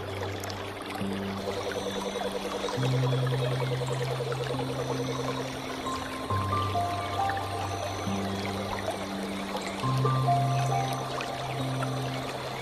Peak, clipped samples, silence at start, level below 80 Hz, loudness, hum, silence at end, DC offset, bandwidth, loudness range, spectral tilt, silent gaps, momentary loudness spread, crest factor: -14 dBFS; under 0.1%; 0 s; -54 dBFS; -31 LUFS; none; 0 s; under 0.1%; 14.5 kHz; 2 LU; -5.5 dB/octave; none; 7 LU; 16 dB